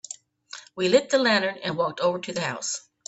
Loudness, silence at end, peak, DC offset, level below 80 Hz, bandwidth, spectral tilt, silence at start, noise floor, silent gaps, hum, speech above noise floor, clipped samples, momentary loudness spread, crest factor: -24 LUFS; 0.3 s; -6 dBFS; under 0.1%; -70 dBFS; 8.4 kHz; -3 dB/octave; 0.1 s; -46 dBFS; none; none; 22 dB; under 0.1%; 20 LU; 20 dB